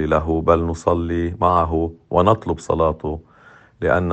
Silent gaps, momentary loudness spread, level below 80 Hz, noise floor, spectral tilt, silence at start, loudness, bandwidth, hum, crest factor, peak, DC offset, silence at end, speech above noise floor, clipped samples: none; 8 LU; -34 dBFS; -48 dBFS; -7.5 dB/octave; 0 s; -19 LUFS; 8.6 kHz; none; 18 dB; 0 dBFS; under 0.1%; 0 s; 30 dB; under 0.1%